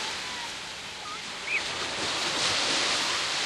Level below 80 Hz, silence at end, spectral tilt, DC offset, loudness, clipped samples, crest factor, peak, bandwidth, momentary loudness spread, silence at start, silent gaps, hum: -60 dBFS; 0 s; -0.5 dB/octave; under 0.1%; -28 LUFS; under 0.1%; 18 dB; -12 dBFS; 13.5 kHz; 11 LU; 0 s; none; none